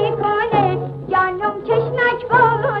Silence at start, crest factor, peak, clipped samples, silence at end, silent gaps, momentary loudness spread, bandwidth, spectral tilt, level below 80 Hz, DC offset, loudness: 0 s; 14 dB; -2 dBFS; under 0.1%; 0 s; none; 6 LU; 5.6 kHz; -8.5 dB/octave; -48 dBFS; under 0.1%; -17 LUFS